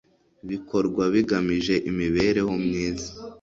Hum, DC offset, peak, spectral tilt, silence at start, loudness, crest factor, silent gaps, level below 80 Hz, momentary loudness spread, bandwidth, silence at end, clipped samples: none; under 0.1%; -8 dBFS; -6 dB/octave; 0.45 s; -24 LUFS; 16 dB; none; -48 dBFS; 12 LU; 7.8 kHz; 0.05 s; under 0.1%